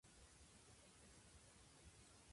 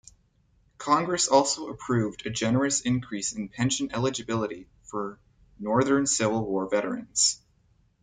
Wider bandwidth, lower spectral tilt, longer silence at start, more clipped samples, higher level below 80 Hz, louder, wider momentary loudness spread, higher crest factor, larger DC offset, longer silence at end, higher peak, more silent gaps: first, 11.5 kHz vs 9.6 kHz; about the same, -3 dB/octave vs -3.5 dB/octave; second, 0.05 s vs 0.8 s; neither; second, -74 dBFS vs -60 dBFS; second, -66 LUFS vs -26 LUFS; second, 1 LU vs 12 LU; second, 14 dB vs 22 dB; neither; second, 0 s vs 0.65 s; second, -54 dBFS vs -6 dBFS; neither